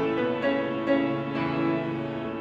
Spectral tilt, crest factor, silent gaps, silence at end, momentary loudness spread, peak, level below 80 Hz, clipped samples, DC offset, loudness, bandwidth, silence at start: -8 dB/octave; 14 dB; none; 0 s; 6 LU; -12 dBFS; -58 dBFS; under 0.1%; under 0.1%; -27 LUFS; 7 kHz; 0 s